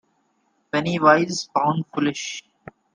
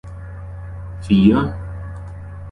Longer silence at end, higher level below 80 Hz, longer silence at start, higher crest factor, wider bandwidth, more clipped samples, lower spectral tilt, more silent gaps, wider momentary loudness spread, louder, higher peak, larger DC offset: first, 0.55 s vs 0 s; second, -64 dBFS vs -34 dBFS; first, 0.75 s vs 0.05 s; about the same, 22 dB vs 18 dB; about the same, 10 kHz vs 10 kHz; neither; second, -5 dB/octave vs -8.5 dB/octave; neither; second, 14 LU vs 20 LU; second, -21 LUFS vs -16 LUFS; about the same, -2 dBFS vs -2 dBFS; neither